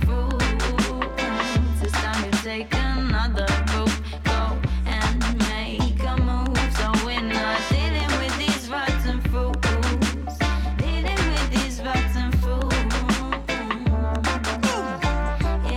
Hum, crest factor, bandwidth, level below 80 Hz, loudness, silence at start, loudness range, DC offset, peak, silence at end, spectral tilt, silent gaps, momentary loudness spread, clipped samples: none; 14 dB; 14.5 kHz; -26 dBFS; -23 LUFS; 0 s; 1 LU; under 0.1%; -8 dBFS; 0 s; -5 dB/octave; none; 3 LU; under 0.1%